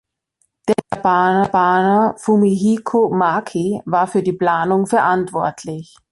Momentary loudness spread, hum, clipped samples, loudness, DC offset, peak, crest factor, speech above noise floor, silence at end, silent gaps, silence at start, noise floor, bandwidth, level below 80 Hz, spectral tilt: 8 LU; none; under 0.1%; -16 LUFS; under 0.1%; -2 dBFS; 14 dB; 51 dB; 0.3 s; none; 0.65 s; -67 dBFS; 11.5 kHz; -56 dBFS; -6.5 dB/octave